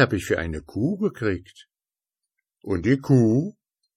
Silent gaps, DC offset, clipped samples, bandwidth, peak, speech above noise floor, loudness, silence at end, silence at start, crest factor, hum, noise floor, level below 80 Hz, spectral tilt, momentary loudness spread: none; under 0.1%; under 0.1%; 15 kHz; -4 dBFS; over 68 dB; -23 LUFS; 0.45 s; 0 s; 20 dB; none; under -90 dBFS; -44 dBFS; -7.5 dB/octave; 13 LU